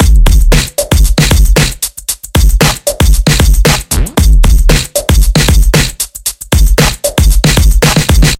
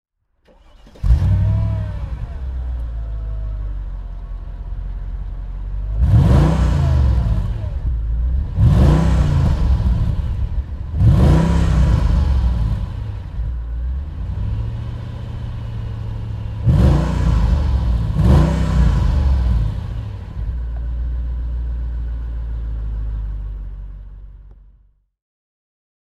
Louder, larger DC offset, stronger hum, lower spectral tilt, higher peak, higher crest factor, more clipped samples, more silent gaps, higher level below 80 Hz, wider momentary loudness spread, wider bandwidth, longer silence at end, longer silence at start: first, -9 LUFS vs -19 LUFS; neither; neither; second, -4 dB/octave vs -8.5 dB/octave; about the same, 0 dBFS vs -2 dBFS; second, 6 dB vs 16 dB; first, 0.5% vs under 0.1%; neither; first, -8 dBFS vs -20 dBFS; second, 5 LU vs 16 LU; first, 16.5 kHz vs 8.4 kHz; second, 0.05 s vs 1.55 s; second, 0 s vs 0.85 s